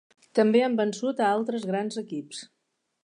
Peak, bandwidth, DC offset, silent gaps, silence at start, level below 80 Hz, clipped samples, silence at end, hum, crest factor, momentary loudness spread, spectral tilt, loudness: -8 dBFS; 11 kHz; under 0.1%; none; 0.35 s; -80 dBFS; under 0.1%; 0.6 s; none; 18 dB; 14 LU; -5.5 dB/octave; -26 LUFS